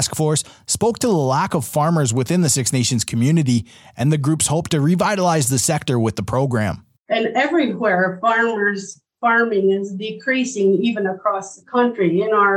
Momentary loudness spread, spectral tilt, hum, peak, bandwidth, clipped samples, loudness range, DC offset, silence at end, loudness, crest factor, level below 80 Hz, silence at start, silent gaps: 6 LU; -4.5 dB/octave; none; -4 dBFS; 16.5 kHz; under 0.1%; 1 LU; under 0.1%; 0 s; -18 LUFS; 14 dB; -52 dBFS; 0 s; 6.99-7.05 s